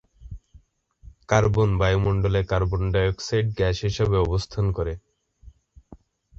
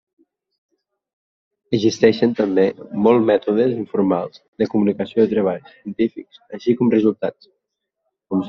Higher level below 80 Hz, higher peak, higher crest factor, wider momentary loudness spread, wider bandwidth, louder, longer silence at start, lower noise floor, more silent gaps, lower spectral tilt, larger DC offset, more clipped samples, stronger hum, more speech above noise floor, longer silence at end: first, -36 dBFS vs -60 dBFS; second, -4 dBFS vs 0 dBFS; about the same, 20 dB vs 20 dB; first, 16 LU vs 11 LU; first, 7.6 kHz vs 6.8 kHz; second, -23 LUFS vs -19 LUFS; second, 0.2 s vs 1.7 s; second, -55 dBFS vs -78 dBFS; second, none vs 4.48-4.53 s; about the same, -6.5 dB/octave vs -6 dB/octave; neither; neither; neither; second, 33 dB vs 60 dB; first, 0.45 s vs 0 s